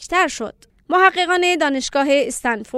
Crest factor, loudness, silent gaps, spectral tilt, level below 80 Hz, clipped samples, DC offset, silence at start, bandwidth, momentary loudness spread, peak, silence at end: 18 dB; -17 LUFS; none; -2 dB/octave; -52 dBFS; under 0.1%; under 0.1%; 0 s; 14.5 kHz; 8 LU; 0 dBFS; 0 s